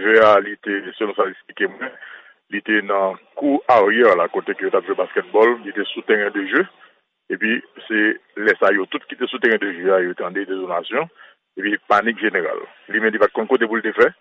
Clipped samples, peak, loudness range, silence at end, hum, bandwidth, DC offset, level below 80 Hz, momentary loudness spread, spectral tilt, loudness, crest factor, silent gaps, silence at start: under 0.1%; -2 dBFS; 4 LU; 0.1 s; none; 7.4 kHz; under 0.1%; -66 dBFS; 11 LU; -6 dB/octave; -19 LUFS; 18 dB; none; 0 s